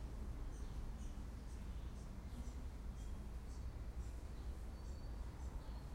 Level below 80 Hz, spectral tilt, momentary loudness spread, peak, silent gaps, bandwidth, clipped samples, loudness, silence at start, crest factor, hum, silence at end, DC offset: -48 dBFS; -6.5 dB/octave; 1 LU; -36 dBFS; none; 15.5 kHz; under 0.1%; -52 LUFS; 0 s; 12 dB; none; 0 s; under 0.1%